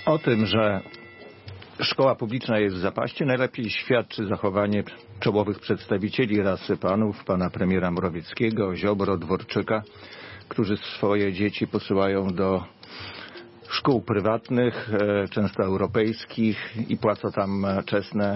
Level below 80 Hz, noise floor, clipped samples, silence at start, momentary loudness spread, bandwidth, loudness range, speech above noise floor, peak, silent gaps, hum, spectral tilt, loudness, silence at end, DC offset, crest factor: -58 dBFS; -44 dBFS; under 0.1%; 0 s; 15 LU; 5.8 kHz; 2 LU; 20 dB; -8 dBFS; none; none; -10 dB/octave; -25 LUFS; 0 s; under 0.1%; 16 dB